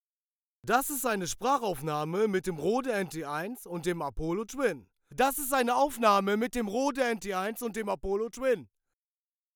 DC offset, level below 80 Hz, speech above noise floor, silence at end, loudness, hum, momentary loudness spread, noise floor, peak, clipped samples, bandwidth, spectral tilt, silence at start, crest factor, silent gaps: under 0.1%; -52 dBFS; over 60 dB; 0.9 s; -30 LUFS; none; 9 LU; under -90 dBFS; -12 dBFS; under 0.1%; over 20 kHz; -4 dB/octave; 0.65 s; 20 dB; none